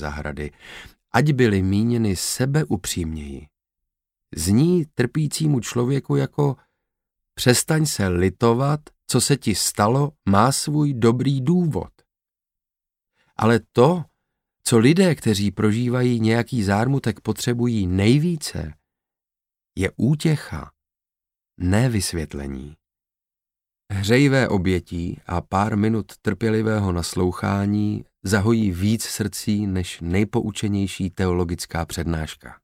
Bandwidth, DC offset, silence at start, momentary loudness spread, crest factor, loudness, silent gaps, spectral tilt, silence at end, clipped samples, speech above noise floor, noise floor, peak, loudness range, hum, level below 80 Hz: 16.5 kHz; under 0.1%; 0 s; 12 LU; 20 dB; -21 LUFS; none; -5.5 dB/octave; 0.1 s; under 0.1%; 69 dB; -89 dBFS; 0 dBFS; 5 LU; none; -44 dBFS